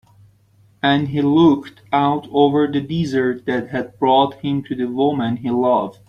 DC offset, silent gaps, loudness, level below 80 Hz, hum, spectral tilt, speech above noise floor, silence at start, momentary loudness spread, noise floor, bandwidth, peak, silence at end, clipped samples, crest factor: under 0.1%; none; -18 LUFS; -54 dBFS; none; -7.5 dB/octave; 37 dB; 0.85 s; 8 LU; -54 dBFS; 7 kHz; -2 dBFS; 0.15 s; under 0.1%; 16 dB